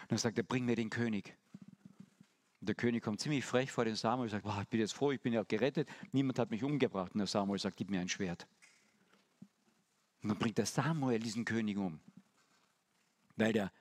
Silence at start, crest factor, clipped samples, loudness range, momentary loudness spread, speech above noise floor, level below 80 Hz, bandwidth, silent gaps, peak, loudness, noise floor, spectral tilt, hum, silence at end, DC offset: 0 s; 22 dB; under 0.1%; 4 LU; 7 LU; 41 dB; -76 dBFS; 14 kHz; none; -16 dBFS; -36 LUFS; -77 dBFS; -5.5 dB/octave; none; 0.1 s; under 0.1%